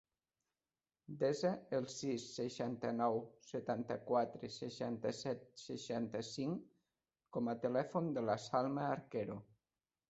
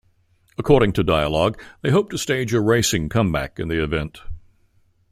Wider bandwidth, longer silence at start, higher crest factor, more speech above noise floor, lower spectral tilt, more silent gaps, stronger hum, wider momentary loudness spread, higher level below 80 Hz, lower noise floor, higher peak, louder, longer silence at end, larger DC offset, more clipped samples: second, 8 kHz vs 16 kHz; first, 1.1 s vs 0.6 s; about the same, 20 dB vs 20 dB; first, over 50 dB vs 41 dB; about the same, -5.5 dB/octave vs -5 dB/octave; neither; neither; about the same, 10 LU vs 12 LU; second, -80 dBFS vs -38 dBFS; first, under -90 dBFS vs -60 dBFS; second, -22 dBFS vs -2 dBFS; second, -41 LUFS vs -20 LUFS; about the same, 0.65 s vs 0.7 s; neither; neither